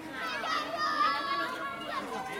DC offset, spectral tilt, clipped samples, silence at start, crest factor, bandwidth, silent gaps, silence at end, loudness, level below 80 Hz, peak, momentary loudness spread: under 0.1%; -2.5 dB/octave; under 0.1%; 0 s; 16 dB; 16.5 kHz; none; 0 s; -32 LUFS; -68 dBFS; -18 dBFS; 8 LU